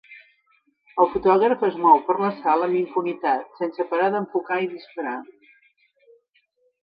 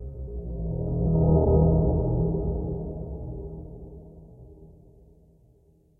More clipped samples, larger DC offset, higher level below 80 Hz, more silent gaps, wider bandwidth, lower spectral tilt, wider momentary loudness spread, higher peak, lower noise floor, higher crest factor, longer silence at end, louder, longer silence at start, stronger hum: neither; neither; second, -62 dBFS vs -32 dBFS; neither; first, 5.2 kHz vs 1.4 kHz; second, -9 dB/octave vs -16 dB/octave; second, 13 LU vs 21 LU; first, -2 dBFS vs -10 dBFS; first, -66 dBFS vs -60 dBFS; about the same, 22 dB vs 18 dB; first, 1.6 s vs 1.3 s; first, -22 LUFS vs -26 LUFS; about the same, 0.1 s vs 0 s; neither